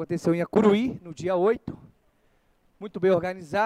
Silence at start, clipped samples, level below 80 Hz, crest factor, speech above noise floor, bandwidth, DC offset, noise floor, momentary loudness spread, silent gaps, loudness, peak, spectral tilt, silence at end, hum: 0 s; under 0.1%; -60 dBFS; 20 dB; 41 dB; 12 kHz; under 0.1%; -65 dBFS; 19 LU; none; -24 LUFS; -6 dBFS; -7 dB/octave; 0 s; none